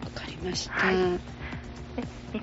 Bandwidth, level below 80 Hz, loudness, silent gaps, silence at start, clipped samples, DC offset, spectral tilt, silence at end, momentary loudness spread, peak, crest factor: 8 kHz; -46 dBFS; -30 LUFS; none; 0 s; under 0.1%; under 0.1%; -3.5 dB/octave; 0 s; 14 LU; -12 dBFS; 20 dB